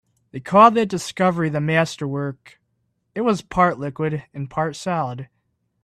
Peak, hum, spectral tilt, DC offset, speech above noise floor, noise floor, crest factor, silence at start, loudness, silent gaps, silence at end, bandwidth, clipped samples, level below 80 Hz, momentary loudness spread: 0 dBFS; none; -6 dB/octave; under 0.1%; 51 dB; -71 dBFS; 20 dB; 0.35 s; -20 LUFS; none; 0.6 s; 13.5 kHz; under 0.1%; -54 dBFS; 16 LU